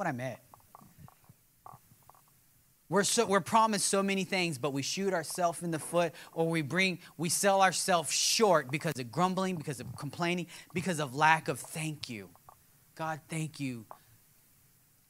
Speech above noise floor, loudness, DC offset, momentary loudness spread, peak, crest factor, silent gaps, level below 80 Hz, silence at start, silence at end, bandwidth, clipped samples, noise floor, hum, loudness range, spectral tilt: 35 dB; -30 LUFS; under 0.1%; 13 LU; -8 dBFS; 24 dB; none; -74 dBFS; 0 s; 1.25 s; 16 kHz; under 0.1%; -66 dBFS; none; 6 LU; -3.5 dB/octave